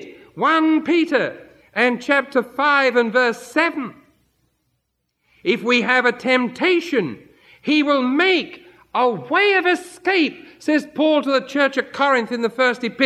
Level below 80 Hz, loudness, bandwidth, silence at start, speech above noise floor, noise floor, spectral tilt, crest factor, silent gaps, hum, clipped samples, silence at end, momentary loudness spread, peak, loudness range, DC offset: -68 dBFS; -18 LUFS; 13 kHz; 0 s; 54 dB; -73 dBFS; -4.5 dB/octave; 18 dB; none; none; under 0.1%; 0 s; 8 LU; -2 dBFS; 3 LU; under 0.1%